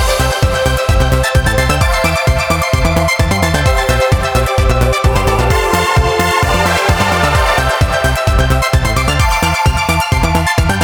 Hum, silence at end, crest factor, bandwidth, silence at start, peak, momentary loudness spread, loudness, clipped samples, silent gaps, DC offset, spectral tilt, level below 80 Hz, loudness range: none; 0 s; 12 dB; over 20 kHz; 0 s; 0 dBFS; 1 LU; -12 LUFS; under 0.1%; none; under 0.1%; -4.5 dB/octave; -18 dBFS; 1 LU